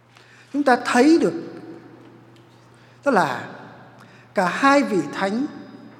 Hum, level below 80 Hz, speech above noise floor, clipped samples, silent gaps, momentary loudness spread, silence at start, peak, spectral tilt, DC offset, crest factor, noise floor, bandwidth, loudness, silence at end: none; -70 dBFS; 31 dB; under 0.1%; none; 22 LU; 0.55 s; 0 dBFS; -5 dB/octave; under 0.1%; 22 dB; -50 dBFS; 14.5 kHz; -20 LUFS; 0.1 s